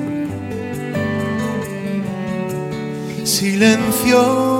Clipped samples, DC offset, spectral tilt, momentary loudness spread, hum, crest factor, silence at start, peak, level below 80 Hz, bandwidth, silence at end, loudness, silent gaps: under 0.1%; under 0.1%; -4.5 dB/octave; 12 LU; none; 18 dB; 0 s; 0 dBFS; -50 dBFS; 16.5 kHz; 0 s; -18 LUFS; none